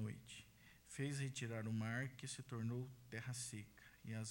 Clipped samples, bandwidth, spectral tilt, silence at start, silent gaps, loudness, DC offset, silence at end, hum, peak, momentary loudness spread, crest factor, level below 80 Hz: under 0.1%; 16.5 kHz; -5 dB/octave; 0 s; none; -48 LUFS; under 0.1%; 0 s; none; -32 dBFS; 14 LU; 16 dB; -76 dBFS